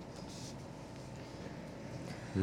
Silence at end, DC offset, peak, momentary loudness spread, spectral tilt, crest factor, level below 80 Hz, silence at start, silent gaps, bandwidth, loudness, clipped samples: 0 s; under 0.1%; -22 dBFS; 3 LU; -6 dB/octave; 22 dB; -62 dBFS; 0 s; none; 16 kHz; -47 LUFS; under 0.1%